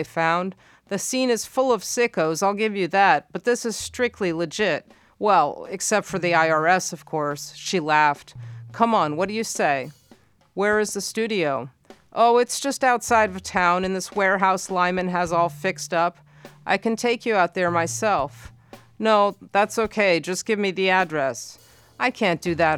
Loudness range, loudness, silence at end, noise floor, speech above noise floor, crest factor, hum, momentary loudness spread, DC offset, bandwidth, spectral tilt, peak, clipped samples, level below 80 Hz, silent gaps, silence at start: 2 LU; -22 LUFS; 0 s; -55 dBFS; 33 dB; 20 dB; none; 8 LU; under 0.1%; 18 kHz; -3.5 dB/octave; -2 dBFS; under 0.1%; -58 dBFS; none; 0 s